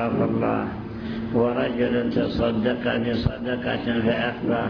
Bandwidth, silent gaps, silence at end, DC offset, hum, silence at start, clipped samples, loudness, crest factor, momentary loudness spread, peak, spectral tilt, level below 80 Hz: 5.4 kHz; none; 0 s; under 0.1%; none; 0 s; under 0.1%; -24 LUFS; 16 dB; 5 LU; -6 dBFS; -9 dB/octave; -42 dBFS